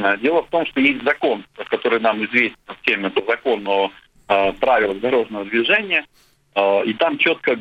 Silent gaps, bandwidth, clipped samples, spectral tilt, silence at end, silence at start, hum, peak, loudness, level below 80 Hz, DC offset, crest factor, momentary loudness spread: none; 8.2 kHz; under 0.1%; -6 dB/octave; 0 s; 0 s; none; 0 dBFS; -19 LUFS; -54 dBFS; under 0.1%; 20 dB; 6 LU